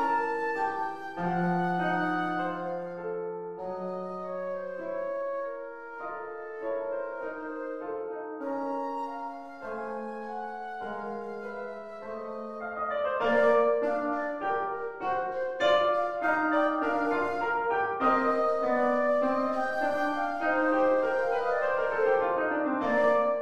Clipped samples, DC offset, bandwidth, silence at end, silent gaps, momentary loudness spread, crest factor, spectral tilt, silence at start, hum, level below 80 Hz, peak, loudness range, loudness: under 0.1%; 0.2%; 9.2 kHz; 0 s; none; 13 LU; 16 dB; -6.5 dB/octave; 0 s; none; -66 dBFS; -12 dBFS; 9 LU; -29 LUFS